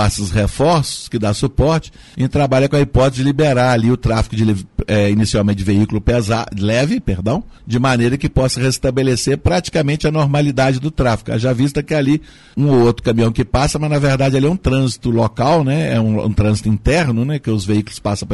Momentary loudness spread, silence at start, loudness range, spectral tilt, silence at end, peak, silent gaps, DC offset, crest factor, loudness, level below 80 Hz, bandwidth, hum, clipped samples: 5 LU; 0 s; 1 LU; -6 dB/octave; 0 s; -4 dBFS; none; 0.4%; 12 dB; -16 LUFS; -30 dBFS; 11.5 kHz; none; under 0.1%